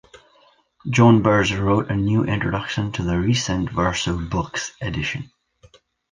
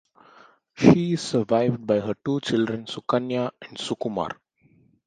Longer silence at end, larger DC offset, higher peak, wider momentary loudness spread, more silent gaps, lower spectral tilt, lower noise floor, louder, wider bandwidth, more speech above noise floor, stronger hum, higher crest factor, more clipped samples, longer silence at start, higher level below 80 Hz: first, 0.9 s vs 0.75 s; neither; about the same, -2 dBFS vs 0 dBFS; about the same, 12 LU vs 13 LU; neither; about the same, -5.5 dB/octave vs -6.5 dB/octave; about the same, -57 dBFS vs -60 dBFS; first, -20 LUFS vs -24 LUFS; about the same, 9.8 kHz vs 9.6 kHz; about the same, 37 dB vs 37 dB; neither; second, 18 dB vs 24 dB; neither; about the same, 0.85 s vs 0.75 s; first, -40 dBFS vs -58 dBFS